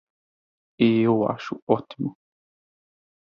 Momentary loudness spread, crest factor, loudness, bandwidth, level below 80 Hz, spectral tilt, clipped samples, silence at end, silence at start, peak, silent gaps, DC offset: 13 LU; 22 dB; -24 LUFS; 6.8 kHz; -64 dBFS; -8.5 dB/octave; under 0.1%; 1.1 s; 0.8 s; -4 dBFS; 1.62-1.67 s; under 0.1%